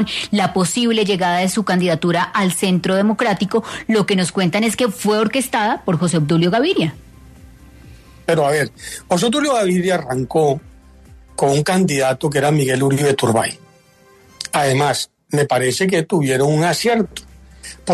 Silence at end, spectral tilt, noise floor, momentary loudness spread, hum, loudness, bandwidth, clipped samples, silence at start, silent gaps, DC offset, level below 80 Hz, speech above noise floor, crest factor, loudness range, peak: 0 s; -5 dB/octave; -49 dBFS; 6 LU; none; -17 LUFS; 13.5 kHz; under 0.1%; 0 s; none; under 0.1%; -50 dBFS; 33 dB; 14 dB; 2 LU; -4 dBFS